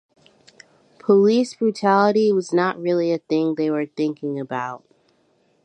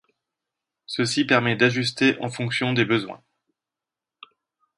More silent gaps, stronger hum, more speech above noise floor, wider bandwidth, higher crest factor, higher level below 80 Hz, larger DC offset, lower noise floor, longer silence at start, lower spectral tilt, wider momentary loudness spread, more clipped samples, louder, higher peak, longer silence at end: neither; neither; second, 43 dB vs 66 dB; second, 9.8 kHz vs 11.5 kHz; about the same, 18 dB vs 22 dB; second, -74 dBFS vs -64 dBFS; neither; second, -63 dBFS vs -88 dBFS; first, 1.1 s vs 0.9 s; first, -6.5 dB/octave vs -5 dB/octave; first, 12 LU vs 8 LU; neither; about the same, -20 LUFS vs -22 LUFS; about the same, -4 dBFS vs -2 dBFS; second, 0.85 s vs 1.6 s